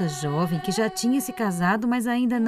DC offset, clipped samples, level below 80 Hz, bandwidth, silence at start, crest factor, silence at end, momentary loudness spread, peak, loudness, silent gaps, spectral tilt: under 0.1%; under 0.1%; -60 dBFS; 16 kHz; 0 s; 12 dB; 0 s; 3 LU; -10 dBFS; -24 LUFS; none; -5.5 dB/octave